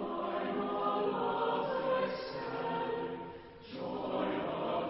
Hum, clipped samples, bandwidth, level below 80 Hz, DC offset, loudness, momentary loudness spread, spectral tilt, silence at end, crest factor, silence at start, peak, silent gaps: none; under 0.1%; 5.6 kHz; -66 dBFS; under 0.1%; -35 LUFS; 10 LU; -4 dB/octave; 0 s; 14 dB; 0 s; -22 dBFS; none